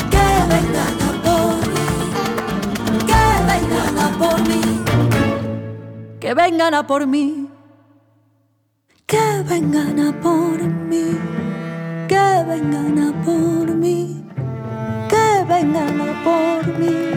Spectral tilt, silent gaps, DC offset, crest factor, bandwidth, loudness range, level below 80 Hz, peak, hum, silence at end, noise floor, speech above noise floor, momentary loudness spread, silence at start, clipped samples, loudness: -5.5 dB/octave; none; under 0.1%; 12 dB; 19 kHz; 4 LU; -32 dBFS; -4 dBFS; none; 0 s; -63 dBFS; 46 dB; 11 LU; 0 s; under 0.1%; -17 LUFS